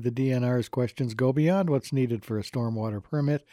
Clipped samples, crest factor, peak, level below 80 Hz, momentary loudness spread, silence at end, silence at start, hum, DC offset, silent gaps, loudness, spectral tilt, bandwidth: under 0.1%; 14 dB; -12 dBFS; -64 dBFS; 7 LU; 0.15 s; 0 s; none; under 0.1%; none; -27 LUFS; -8 dB/octave; 14 kHz